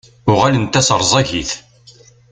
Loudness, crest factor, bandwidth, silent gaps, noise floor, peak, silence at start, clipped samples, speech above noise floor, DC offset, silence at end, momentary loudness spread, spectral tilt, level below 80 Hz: -14 LUFS; 16 dB; 9.6 kHz; none; -45 dBFS; 0 dBFS; 0.25 s; under 0.1%; 31 dB; under 0.1%; 0.7 s; 10 LU; -4 dB/octave; -42 dBFS